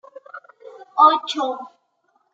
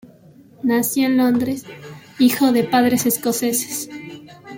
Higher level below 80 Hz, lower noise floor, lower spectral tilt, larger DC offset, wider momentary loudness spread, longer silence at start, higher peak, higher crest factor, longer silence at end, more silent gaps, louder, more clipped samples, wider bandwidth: second, under -90 dBFS vs -60 dBFS; first, -66 dBFS vs -47 dBFS; second, -1 dB/octave vs -4 dB/octave; neither; first, 26 LU vs 21 LU; second, 0.35 s vs 0.65 s; about the same, -2 dBFS vs -4 dBFS; about the same, 20 dB vs 16 dB; first, 0.65 s vs 0 s; neither; about the same, -18 LUFS vs -18 LUFS; neither; second, 7.8 kHz vs 17 kHz